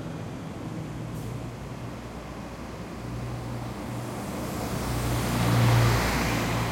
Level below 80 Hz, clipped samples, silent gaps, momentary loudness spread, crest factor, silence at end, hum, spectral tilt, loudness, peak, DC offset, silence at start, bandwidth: -40 dBFS; under 0.1%; none; 16 LU; 18 dB; 0 s; none; -5.5 dB/octave; -29 LUFS; -10 dBFS; under 0.1%; 0 s; 16.5 kHz